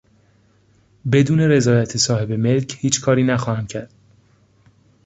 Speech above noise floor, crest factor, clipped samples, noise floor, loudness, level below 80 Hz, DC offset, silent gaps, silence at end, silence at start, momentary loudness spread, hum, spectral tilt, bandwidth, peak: 39 dB; 16 dB; under 0.1%; -56 dBFS; -18 LUFS; -52 dBFS; under 0.1%; none; 1.2 s; 1.05 s; 10 LU; none; -5 dB/octave; 8.2 kHz; -2 dBFS